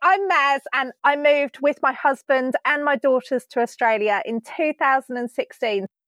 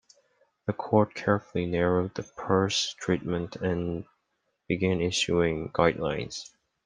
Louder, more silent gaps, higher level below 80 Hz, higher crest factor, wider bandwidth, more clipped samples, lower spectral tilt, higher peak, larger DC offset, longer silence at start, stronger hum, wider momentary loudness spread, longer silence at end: first, -21 LUFS vs -28 LUFS; neither; second, under -90 dBFS vs -56 dBFS; second, 16 dB vs 22 dB; first, 13 kHz vs 10 kHz; neither; about the same, -4 dB/octave vs -5 dB/octave; about the same, -4 dBFS vs -6 dBFS; neither; second, 0 s vs 0.65 s; neither; second, 7 LU vs 11 LU; second, 0.2 s vs 0.4 s